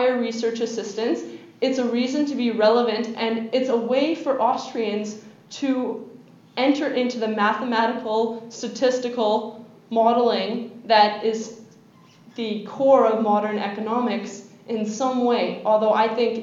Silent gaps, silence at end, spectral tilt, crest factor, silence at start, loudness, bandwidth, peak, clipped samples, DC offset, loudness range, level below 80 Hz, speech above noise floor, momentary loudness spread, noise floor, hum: none; 0 s; -4.5 dB/octave; 20 dB; 0 s; -22 LUFS; 7.8 kHz; -2 dBFS; under 0.1%; under 0.1%; 3 LU; -84 dBFS; 30 dB; 13 LU; -51 dBFS; none